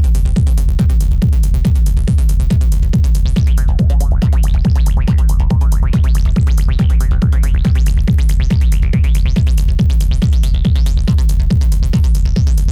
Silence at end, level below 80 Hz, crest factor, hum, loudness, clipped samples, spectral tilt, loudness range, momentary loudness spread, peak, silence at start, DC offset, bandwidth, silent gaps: 0 s; -12 dBFS; 4 dB; none; -14 LUFS; under 0.1%; -7 dB/octave; 0 LU; 0 LU; -6 dBFS; 0 s; under 0.1%; 13.5 kHz; none